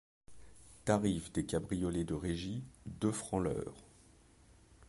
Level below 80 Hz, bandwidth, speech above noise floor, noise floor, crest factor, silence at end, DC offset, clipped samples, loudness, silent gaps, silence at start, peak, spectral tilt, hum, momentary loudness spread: -54 dBFS; 11.5 kHz; 27 dB; -63 dBFS; 22 dB; 0.05 s; under 0.1%; under 0.1%; -37 LUFS; none; 0.3 s; -16 dBFS; -6 dB/octave; none; 11 LU